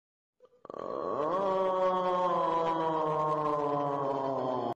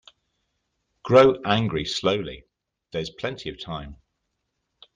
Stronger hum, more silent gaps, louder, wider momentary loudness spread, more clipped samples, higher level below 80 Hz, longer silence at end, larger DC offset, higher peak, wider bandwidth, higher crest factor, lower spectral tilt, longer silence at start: neither; neither; second, -30 LUFS vs -22 LUFS; second, 7 LU vs 21 LU; neither; second, -70 dBFS vs -52 dBFS; second, 0 s vs 1 s; neither; second, -20 dBFS vs -4 dBFS; about the same, 8.6 kHz vs 9.4 kHz; second, 12 dB vs 22 dB; first, -7 dB/octave vs -5.5 dB/octave; second, 0.7 s vs 1.05 s